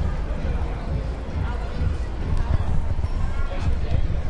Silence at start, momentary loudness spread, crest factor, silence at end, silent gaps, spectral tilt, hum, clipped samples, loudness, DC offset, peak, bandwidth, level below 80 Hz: 0 s; 4 LU; 14 dB; 0 s; none; -7.5 dB/octave; none; under 0.1%; -27 LUFS; under 0.1%; -8 dBFS; 8 kHz; -24 dBFS